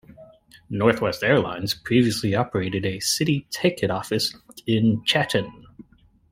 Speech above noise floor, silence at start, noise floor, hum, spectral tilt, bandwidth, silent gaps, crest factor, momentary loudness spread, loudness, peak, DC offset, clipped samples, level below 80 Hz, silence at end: 34 dB; 0.2 s; -56 dBFS; none; -4.5 dB/octave; 16 kHz; none; 22 dB; 6 LU; -22 LUFS; -2 dBFS; under 0.1%; under 0.1%; -54 dBFS; 0.5 s